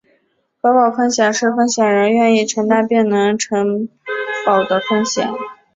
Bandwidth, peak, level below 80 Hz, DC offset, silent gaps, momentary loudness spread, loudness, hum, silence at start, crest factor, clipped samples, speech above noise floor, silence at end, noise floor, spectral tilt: 7.8 kHz; -2 dBFS; -62 dBFS; under 0.1%; none; 9 LU; -15 LUFS; none; 0.65 s; 14 dB; under 0.1%; 48 dB; 0.2 s; -63 dBFS; -4 dB/octave